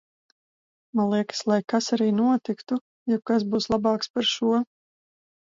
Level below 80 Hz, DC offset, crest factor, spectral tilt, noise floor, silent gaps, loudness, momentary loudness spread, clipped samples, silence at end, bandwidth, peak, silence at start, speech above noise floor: -62 dBFS; under 0.1%; 16 dB; -5 dB/octave; under -90 dBFS; 2.81-3.06 s, 4.10-4.14 s; -25 LUFS; 7 LU; under 0.1%; 0.8 s; 7.6 kHz; -10 dBFS; 0.95 s; over 66 dB